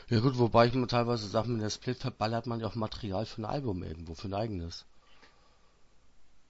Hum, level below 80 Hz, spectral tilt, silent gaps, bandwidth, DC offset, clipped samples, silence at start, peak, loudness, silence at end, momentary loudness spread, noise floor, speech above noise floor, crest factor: none; -54 dBFS; -6.5 dB/octave; none; 8 kHz; under 0.1%; under 0.1%; 0 s; -10 dBFS; -32 LUFS; 0.05 s; 14 LU; -61 dBFS; 31 dB; 22 dB